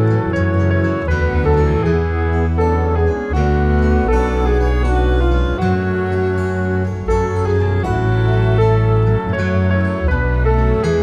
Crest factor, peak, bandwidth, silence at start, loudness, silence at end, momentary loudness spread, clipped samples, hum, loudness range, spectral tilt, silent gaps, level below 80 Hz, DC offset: 12 dB; -2 dBFS; 7.6 kHz; 0 s; -16 LUFS; 0 s; 3 LU; under 0.1%; none; 1 LU; -8.5 dB/octave; none; -20 dBFS; under 0.1%